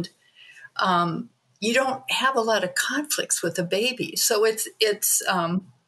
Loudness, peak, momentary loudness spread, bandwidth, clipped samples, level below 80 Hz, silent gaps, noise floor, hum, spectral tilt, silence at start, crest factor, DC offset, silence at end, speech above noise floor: -23 LUFS; -4 dBFS; 8 LU; 13 kHz; under 0.1%; -76 dBFS; none; -52 dBFS; none; -2.5 dB/octave; 0 s; 20 dB; under 0.1%; 0.25 s; 28 dB